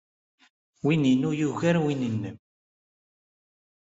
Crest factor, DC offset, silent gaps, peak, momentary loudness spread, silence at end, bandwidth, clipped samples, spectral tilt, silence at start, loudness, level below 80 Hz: 18 dB; under 0.1%; none; -10 dBFS; 9 LU; 1.6 s; 8 kHz; under 0.1%; -7 dB/octave; 0.85 s; -25 LUFS; -66 dBFS